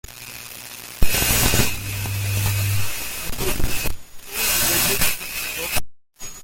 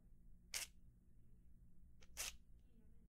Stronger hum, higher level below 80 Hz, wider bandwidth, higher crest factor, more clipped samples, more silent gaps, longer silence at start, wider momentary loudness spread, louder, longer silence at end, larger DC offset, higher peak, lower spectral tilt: neither; first, -30 dBFS vs -66 dBFS; about the same, 17 kHz vs 16 kHz; second, 18 dB vs 30 dB; neither; neither; about the same, 0.1 s vs 0 s; first, 17 LU vs 10 LU; first, -21 LUFS vs -50 LUFS; about the same, 0 s vs 0 s; neither; first, -2 dBFS vs -28 dBFS; first, -2.5 dB/octave vs 0 dB/octave